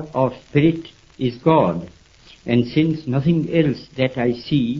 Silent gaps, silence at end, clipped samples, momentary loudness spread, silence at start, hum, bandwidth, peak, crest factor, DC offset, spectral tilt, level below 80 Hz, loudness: none; 0 s; under 0.1%; 9 LU; 0 s; none; 7.2 kHz; -2 dBFS; 18 dB; under 0.1%; -8.5 dB/octave; -48 dBFS; -20 LUFS